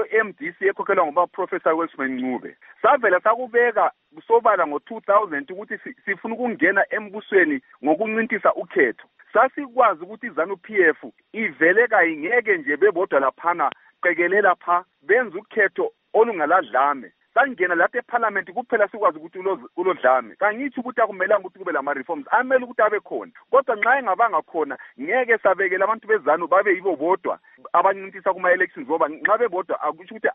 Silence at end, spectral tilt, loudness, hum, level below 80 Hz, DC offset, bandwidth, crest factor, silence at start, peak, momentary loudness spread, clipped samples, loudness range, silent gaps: 0 s; -2.5 dB/octave; -21 LUFS; none; -76 dBFS; under 0.1%; 3.9 kHz; 18 dB; 0 s; -4 dBFS; 9 LU; under 0.1%; 2 LU; none